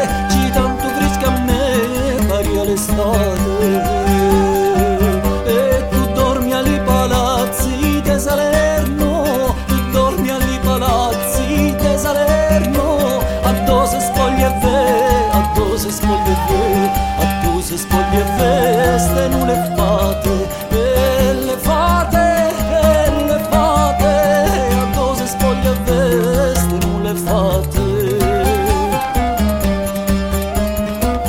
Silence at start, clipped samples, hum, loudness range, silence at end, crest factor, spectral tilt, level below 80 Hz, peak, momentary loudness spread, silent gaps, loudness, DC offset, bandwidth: 0 s; under 0.1%; none; 2 LU; 0 s; 14 dB; -5.5 dB/octave; -22 dBFS; 0 dBFS; 4 LU; none; -15 LUFS; 0.3%; 17 kHz